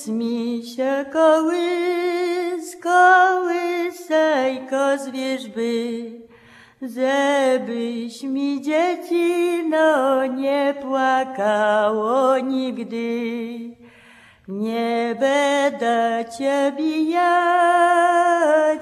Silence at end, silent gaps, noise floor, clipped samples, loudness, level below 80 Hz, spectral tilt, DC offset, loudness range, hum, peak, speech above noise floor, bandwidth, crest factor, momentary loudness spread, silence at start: 0 s; none; -49 dBFS; under 0.1%; -20 LUFS; -72 dBFS; -4 dB/octave; under 0.1%; 5 LU; none; -2 dBFS; 30 dB; 13.5 kHz; 16 dB; 11 LU; 0 s